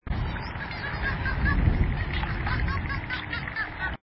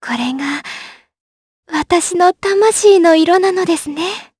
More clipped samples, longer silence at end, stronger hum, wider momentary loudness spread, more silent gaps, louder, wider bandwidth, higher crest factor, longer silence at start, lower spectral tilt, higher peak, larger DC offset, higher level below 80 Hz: neither; about the same, 0.05 s vs 0.15 s; neither; second, 7 LU vs 13 LU; second, none vs 1.20-1.63 s; second, -29 LUFS vs -13 LUFS; second, 5.8 kHz vs 11 kHz; about the same, 18 dB vs 14 dB; about the same, 0.05 s vs 0 s; first, -10 dB/octave vs -2.5 dB/octave; second, -10 dBFS vs 0 dBFS; neither; first, -32 dBFS vs -52 dBFS